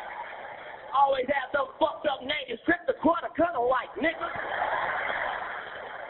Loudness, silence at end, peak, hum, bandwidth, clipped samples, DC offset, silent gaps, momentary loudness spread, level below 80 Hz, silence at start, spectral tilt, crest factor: -28 LUFS; 0 s; -12 dBFS; none; 4.3 kHz; under 0.1%; under 0.1%; none; 13 LU; -60 dBFS; 0 s; -8 dB/octave; 18 dB